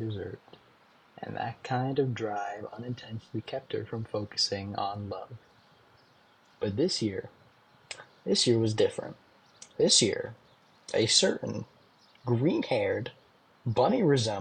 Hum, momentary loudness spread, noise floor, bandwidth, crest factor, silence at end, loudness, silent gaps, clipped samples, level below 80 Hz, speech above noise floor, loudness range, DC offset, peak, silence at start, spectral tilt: none; 19 LU; -62 dBFS; 10 kHz; 22 dB; 0 s; -29 LUFS; none; under 0.1%; -70 dBFS; 33 dB; 8 LU; under 0.1%; -8 dBFS; 0 s; -4 dB/octave